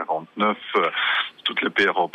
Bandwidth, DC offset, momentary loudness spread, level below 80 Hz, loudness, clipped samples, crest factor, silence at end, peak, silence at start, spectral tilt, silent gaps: 10.5 kHz; under 0.1%; 4 LU; -72 dBFS; -22 LUFS; under 0.1%; 16 dB; 0.05 s; -8 dBFS; 0 s; -4.5 dB/octave; none